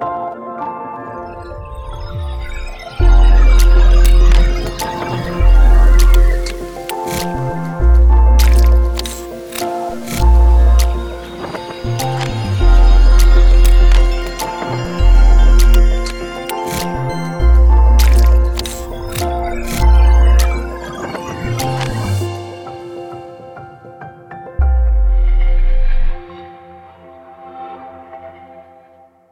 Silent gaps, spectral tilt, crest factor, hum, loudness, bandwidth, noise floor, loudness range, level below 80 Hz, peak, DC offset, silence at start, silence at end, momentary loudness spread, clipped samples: none; -6 dB/octave; 12 dB; none; -15 LUFS; 16 kHz; -46 dBFS; 9 LU; -12 dBFS; 0 dBFS; under 0.1%; 0 s; 0.7 s; 19 LU; under 0.1%